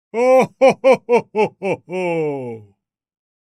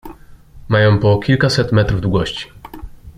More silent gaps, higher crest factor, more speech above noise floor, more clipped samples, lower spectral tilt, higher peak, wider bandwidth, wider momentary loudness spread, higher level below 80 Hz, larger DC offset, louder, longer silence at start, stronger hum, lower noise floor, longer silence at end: neither; about the same, 18 dB vs 14 dB; first, 41 dB vs 25 dB; neither; about the same, -6 dB/octave vs -6.5 dB/octave; about the same, 0 dBFS vs -2 dBFS; first, 12.5 kHz vs 11 kHz; second, 13 LU vs 22 LU; second, -70 dBFS vs -34 dBFS; neither; about the same, -17 LUFS vs -15 LUFS; about the same, 0.15 s vs 0.05 s; neither; first, -57 dBFS vs -39 dBFS; first, 0.8 s vs 0.05 s